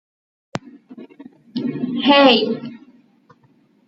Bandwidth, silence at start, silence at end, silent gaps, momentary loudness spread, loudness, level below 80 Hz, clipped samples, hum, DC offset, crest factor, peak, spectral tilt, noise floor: 7.6 kHz; 0.55 s; 1.1 s; none; 22 LU; -16 LUFS; -66 dBFS; under 0.1%; none; under 0.1%; 20 dB; -2 dBFS; -5.5 dB/octave; -57 dBFS